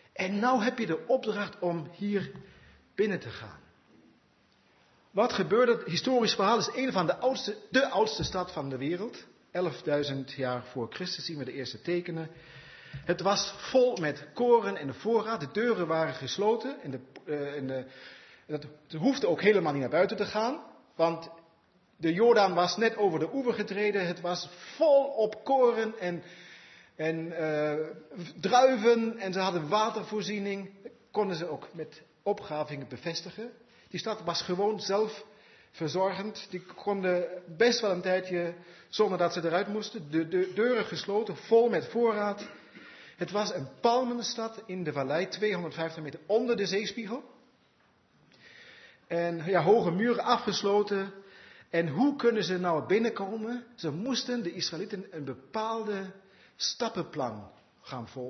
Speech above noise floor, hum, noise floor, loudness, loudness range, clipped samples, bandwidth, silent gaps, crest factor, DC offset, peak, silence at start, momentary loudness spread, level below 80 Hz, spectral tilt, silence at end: 37 dB; none; -66 dBFS; -30 LUFS; 7 LU; under 0.1%; 6.4 kHz; none; 22 dB; under 0.1%; -8 dBFS; 0.15 s; 16 LU; -68 dBFS; -5 dB/octave; 0 s